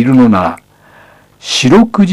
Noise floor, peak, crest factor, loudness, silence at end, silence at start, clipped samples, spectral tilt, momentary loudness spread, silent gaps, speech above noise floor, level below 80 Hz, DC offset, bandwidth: -42 dBFS; 0 dBFS; 10 dB; -9 LUFS; 0 s; 0 s; under 0.1%; -5.5 dB/octave; 18 LU; none; 34 dB; -42 dBFS; under 0.1%; 12 kHz